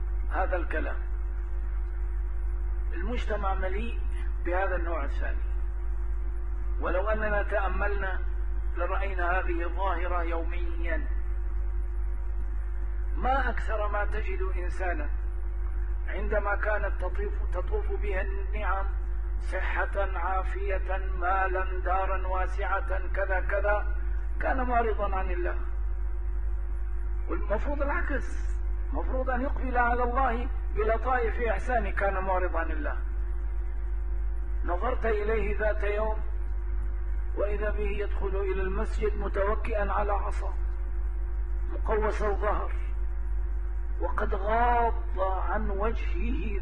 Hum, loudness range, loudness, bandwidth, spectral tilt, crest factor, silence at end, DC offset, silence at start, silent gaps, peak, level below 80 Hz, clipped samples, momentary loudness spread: none; 3 LU; -31 LUFS; 4.1 kHz; -8 dB/octave; 16 dB; 0 s; 2%; 0 s; none; -14 dBFS; -30 dBFS; under 0.1%; 7 LU